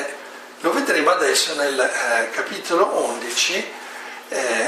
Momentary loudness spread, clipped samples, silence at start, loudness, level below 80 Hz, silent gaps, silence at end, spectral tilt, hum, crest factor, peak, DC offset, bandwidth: 16 LU; under 0.1%; 0 s; -20 LUFS; -80 dBFS; none; 0 s; -0.5 dB/octave; none; 18 dB; -4 dBFS; under 0.1%; 15.5 kHz